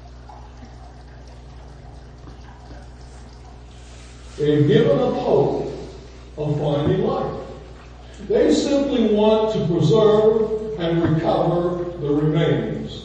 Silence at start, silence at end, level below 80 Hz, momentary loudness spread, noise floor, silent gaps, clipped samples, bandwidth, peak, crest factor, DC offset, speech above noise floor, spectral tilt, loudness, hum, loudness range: 0 s; 0 s; -42 dBFS; 25 LU; -40 dBFS; none; under 0.1%; 9 kHz; -2 dBFS; 20 dB; under 0.1%; 22 dB; -7.5 dB/octave; -19 LUFS; 60 Hz at -40 dBFS; 6 LU